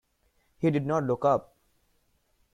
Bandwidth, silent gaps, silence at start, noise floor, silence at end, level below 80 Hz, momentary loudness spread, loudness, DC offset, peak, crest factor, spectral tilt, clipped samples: 11 kHz; none; 0.6 s; -70 dBFS; 1.1 s; -64 dBFS; 4 LU; -27 LUFS; under 0.1%; -12 dBFS; 18 dB; -8.5 dB/octave; under 0.1%